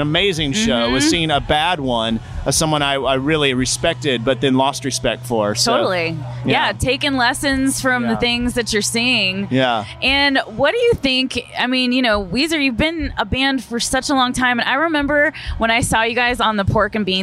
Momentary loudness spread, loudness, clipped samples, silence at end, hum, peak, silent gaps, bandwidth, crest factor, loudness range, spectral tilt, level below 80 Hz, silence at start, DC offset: 4 LU; -17 LUFS; under 0.1%; 0 s; none; -4 dBFS; none; 15.5 kHz; 12 dB; 1 LU; -3.5 dB/octave; -36 dBFS; 0 s; under 0.1%